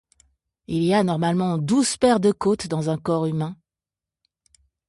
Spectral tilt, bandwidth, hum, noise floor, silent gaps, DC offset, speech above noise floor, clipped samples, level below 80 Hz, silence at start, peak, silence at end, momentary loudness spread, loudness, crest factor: -6 dB/octave; 11.5 kHz; none; -90 dBFS; none; under 0.1%; 69 dB; under 0.1%; -56 dBFS; 0.7 s; -6 dBFS; 1.35 s; 7 LU; -22 LUFS; 16 dB